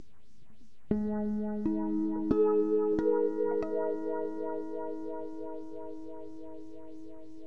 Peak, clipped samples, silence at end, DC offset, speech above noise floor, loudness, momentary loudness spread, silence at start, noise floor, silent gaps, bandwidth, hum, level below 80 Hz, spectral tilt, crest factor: -14 dBFS; under 0.1%; 0 s; 0.9%; 32 dB; -32 LUFS; 19 LU; 0.9 s; -64 dBFS; none; 6 kHz; none; -58 dBFS; -10 dB/octave; 18 dB